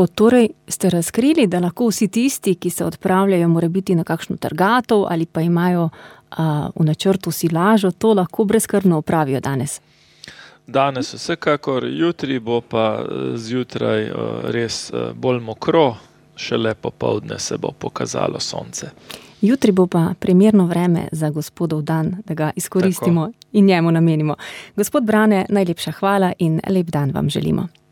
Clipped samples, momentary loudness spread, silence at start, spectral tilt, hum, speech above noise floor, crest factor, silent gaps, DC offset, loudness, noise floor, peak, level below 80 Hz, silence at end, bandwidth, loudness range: under 0.1%; 9 LU; 0 s; -6 dB/octave; none; 25 dB; 16 dB; none; under 0.1%; -18 LUFS; -43 dBFS; -2 dBFS; -54 dBFS; 0.25 s; 18 kHz; 4 LU